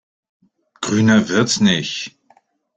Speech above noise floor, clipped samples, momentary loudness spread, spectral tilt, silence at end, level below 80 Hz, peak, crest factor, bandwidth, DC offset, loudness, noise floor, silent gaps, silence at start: 41 dB; under 0.1%; 13 LU; -4.5 dB/octave; 0.7 s; -54 dBFS; -2 dBFS; 16 dB; 9.2 kHz; under 0.1%; -17 LUFS; -57 dBFS; none; 0.8 s